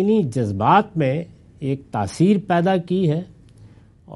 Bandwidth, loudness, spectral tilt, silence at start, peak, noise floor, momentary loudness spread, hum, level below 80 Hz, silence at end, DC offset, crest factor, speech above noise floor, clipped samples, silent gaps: 11.5 kHz; -20 LUFS; -7.5 dB/octave; 0 s; -2 dBFS; -47 dBFS; 11 LU; none; -56 dBFS; 0 s; under 0.1%; 18 dB; 28 dB; under 0.1%; none